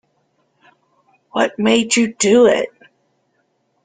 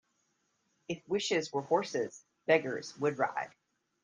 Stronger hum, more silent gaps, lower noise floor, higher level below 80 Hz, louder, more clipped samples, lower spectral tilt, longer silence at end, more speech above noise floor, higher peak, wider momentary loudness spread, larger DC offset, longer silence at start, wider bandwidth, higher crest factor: neither; neither; second, -65 dBFS vs -77 dBFS; first, -60 dBFS vs -82 dBFS; first, -15 LUFS vs -33 LUFS; neither; about the same, -3.5 dB/octave vs -4 dB/octave; first, 1.15 s vs 0.55 s; first, 51 dB vs 45 dB; first, -2 dBFS vs -12 dBFS; about the same, 11 LU vs 12 LU; neither; first, 1.35 s vs 0.9 s; about the same, 9.6 kHz vs 9.6 kHz; about the same, 18 dB vs 22 dB